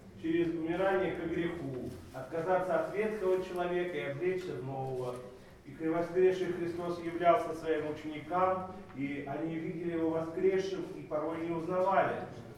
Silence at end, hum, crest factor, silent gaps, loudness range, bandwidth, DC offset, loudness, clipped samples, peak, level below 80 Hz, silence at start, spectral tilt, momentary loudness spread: 0 s; none; 20 dB; none; 3 LU; 13 kHz; under 0.1%; -34 LUFS; under 0.1%; -14 dBFS; -62 dBFS; 0 s; -7 dB/octave; 11 LU